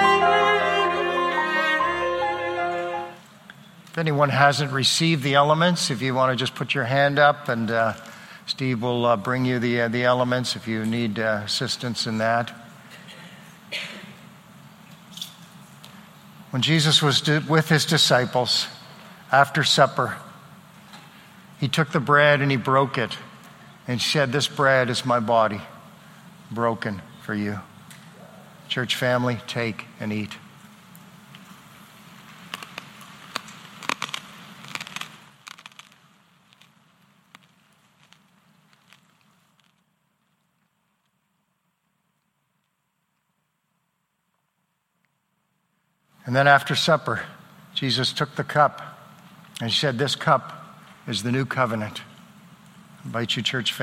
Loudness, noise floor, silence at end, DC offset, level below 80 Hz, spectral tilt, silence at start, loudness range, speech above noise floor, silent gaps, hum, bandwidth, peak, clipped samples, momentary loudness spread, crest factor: -22 LUFS; -74 dBFS; 0 s; under 0.1%; -64 dBFS; -4.5 dB/octave; 0 s; 15 LU; 53 dB; none; none; 16.5 kHz; -2 dBFS; under 0.1%; 22 LU; 22 dB